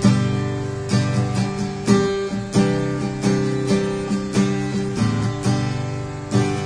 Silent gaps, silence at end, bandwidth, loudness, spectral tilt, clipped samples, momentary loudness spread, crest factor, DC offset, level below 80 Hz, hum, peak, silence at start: none; 0 s; 10.5 kHz; -21 LUFS; -6.5 dB/octave; under 0.1%; 6 LU; 16 dB; under 0.1%; -42 dBFS; none; -4 dBFS; 0 s